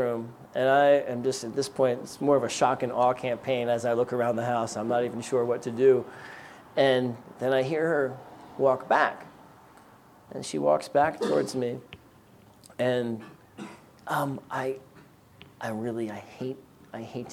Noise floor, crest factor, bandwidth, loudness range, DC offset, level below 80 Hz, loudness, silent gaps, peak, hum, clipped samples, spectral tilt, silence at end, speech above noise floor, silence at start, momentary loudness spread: -55 dBFS; 18 dB; 16 kHz; 8 LU; under 0.1%; -70 dBFS; -27 LUFS; none; -8 dBFS; none; under 0.1%; -5 dB/octave; 0 s; 29 dB; 0 s; 19 LU